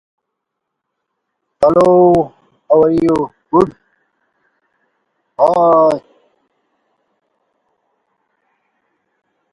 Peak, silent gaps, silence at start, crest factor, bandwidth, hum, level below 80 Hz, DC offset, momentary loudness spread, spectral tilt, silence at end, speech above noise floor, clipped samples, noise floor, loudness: 0 dBFS; none; 1.6 s; 16 dB; 11 kHz; none; -50 dBFS; under 0.1%; 10 LU; -8.5 dB/octave; 3.55 s; 66 dB; under 0.1%; -77 dBFS; -13 LUFS